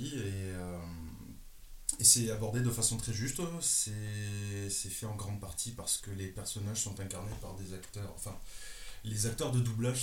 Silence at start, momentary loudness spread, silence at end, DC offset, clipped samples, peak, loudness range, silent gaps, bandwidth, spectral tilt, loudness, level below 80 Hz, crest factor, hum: 0 s; 16 LU; 0 s; under 0.1%; under 0.1%; -8 dBFS; 9 LU; none; 17 kHz; -3.5 dB/octave; -33 LUFS; -52 dBFS; 28 dB; none